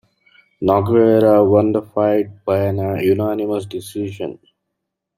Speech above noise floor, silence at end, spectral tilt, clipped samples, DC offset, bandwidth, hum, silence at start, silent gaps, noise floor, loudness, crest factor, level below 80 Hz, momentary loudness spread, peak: 62 dB; 0.85 s; -8 dB/octave; under 0.1%; under 0.1%; 15.5 kHz; none; 0.6 s; none; -78 dBFS; -17 LUFS; 16 dB; -56 dBFS; 14 LU; -2 dBFS